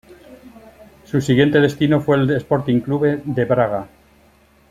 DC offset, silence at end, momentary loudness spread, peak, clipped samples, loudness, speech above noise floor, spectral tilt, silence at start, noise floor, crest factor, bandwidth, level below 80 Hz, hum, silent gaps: under 0.1%; 0.85 s; 7 LU; -2 dBFS; under 0.1%; -18 LUFS; 36 dB; -7.5 dB/octave; 0.1 s; -53 dBFS; 16 dB; 13.5 kHz; -50 dBFS; none; none